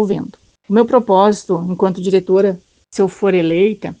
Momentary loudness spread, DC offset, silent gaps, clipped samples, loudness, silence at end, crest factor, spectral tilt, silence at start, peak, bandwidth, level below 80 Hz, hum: 9 LU; under 0.1%; none; under 0.1%; -15 LUFS; 0.05 s; 14 dB; -7 dB/octave; 0 s; 0 dBFS; 9.2 kHz; -56 dBFS; none